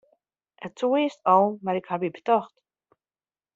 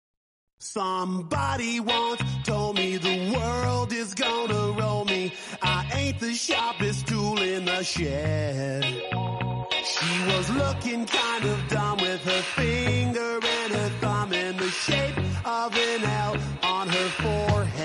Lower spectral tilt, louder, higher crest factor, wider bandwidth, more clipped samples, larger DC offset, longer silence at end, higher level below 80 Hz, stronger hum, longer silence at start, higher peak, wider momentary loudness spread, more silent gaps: about the same, -5 dB/octave vs -4.5 dB/octave; about the same, -24 LUFS vs -26 LUFS; about the same, 20 dB vs 16 dB; second, 7.8 kHz vs 11.5 kHz; neither; neither; first, 1.1 s vs 0 s; second, -76 dBFS vs -46 dBFS; neither; about the same, 0.6 s vs 0.6 s; first, -6 dBFS vs -10 dBFS; first, 19 LU vs 4 LU; neither